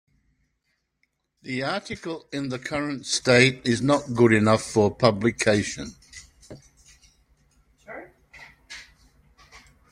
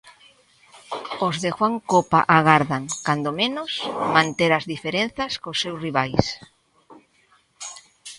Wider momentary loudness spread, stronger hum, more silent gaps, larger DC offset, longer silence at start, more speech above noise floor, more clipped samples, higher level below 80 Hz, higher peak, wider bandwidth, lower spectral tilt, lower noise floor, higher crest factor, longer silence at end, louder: first, 24 LU vs 18 LU; neither; neither; neither; first, 1.45 s vs 0.05 s; first, 52 dB vs 39 dB; neither; about the same, -56 dBFS vs -54 dBFS; about the same, -2 dBFS vs 0 dBFS; first, 13.5 kHz vs 11.5 kHz; about the same, -5 dB/octave vs -4.5 dB/octave; first, -75 dBFS vs -61 dBFS; about the same, 24 dB vs 22 dB; first, 0.35 s vs 0 s; about the same, -22 LUFS vs -21 LUFS